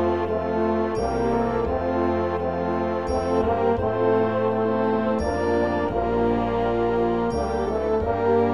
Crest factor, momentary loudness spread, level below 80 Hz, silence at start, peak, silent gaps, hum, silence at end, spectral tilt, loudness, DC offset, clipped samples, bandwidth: 14 dB; 3 LU; -40 dBFS; 0 s; -8 dBFS; none; none; 0 s; -8 dB/octave; -23 LUFS; 0.6%; under 0.1%; 11 kHz